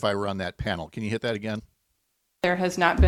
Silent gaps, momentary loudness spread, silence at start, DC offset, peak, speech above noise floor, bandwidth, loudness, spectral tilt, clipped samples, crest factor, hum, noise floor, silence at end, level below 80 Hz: none; 8 LU; 0 s; under 0.1%; -6 dBFS; 50 dB; 13.5 kHz; -28 LUFS; -6 dB/octave; under 0.1%; 20 dB; none; -74 dBFS; 0 s; -34 dBFS